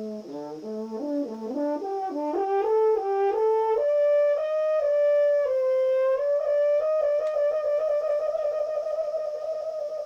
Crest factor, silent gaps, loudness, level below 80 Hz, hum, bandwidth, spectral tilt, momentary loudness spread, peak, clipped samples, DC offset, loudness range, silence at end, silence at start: 8 dB; none; -25 LUFS; -70 dBFS; none; 7 kHz; -6 dB/octave; 9 LU; -16 dBFS; under 0.1%; under 0.1%; 4 LU; 0 s; 0 s